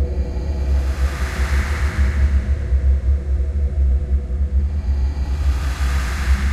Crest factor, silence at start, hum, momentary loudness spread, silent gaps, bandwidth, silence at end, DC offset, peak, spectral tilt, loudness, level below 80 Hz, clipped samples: 12 dB; 0 s; none; 4 LU; none; 12 kHz; 0 s; under 0.1%; -6 dBFS; -6.5 dB/octave; -21 LUFS; -18 dBFS; under 0.1%